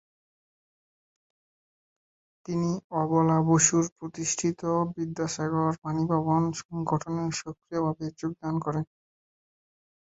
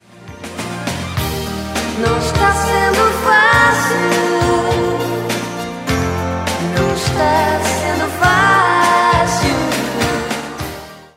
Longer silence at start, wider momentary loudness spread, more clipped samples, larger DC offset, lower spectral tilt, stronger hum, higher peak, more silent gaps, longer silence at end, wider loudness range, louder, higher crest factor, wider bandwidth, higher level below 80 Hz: first, 2.5 s vs 0.2 s; about the same, 11 LU vs 12 LU; neither; neither; about the same, -5.5 dB/octave vs -4.5 dB/octave; neither; second, -8 dBFS vs 0 dBFS; first, 2.84-2.90 s, 3.92-3.96 s, 5.78-5.82 s, 6.65-6.69 s vs none; first, 1.25 s vs 0.1 s; about the same, 6 LU vs 4 LU; second, -28 LUFS vs -15 LUFS; first, 22 dB vs 14 dB; second, 8.2 kHz vs 16 kHz; second, -64 dBFS vs -32 dBFS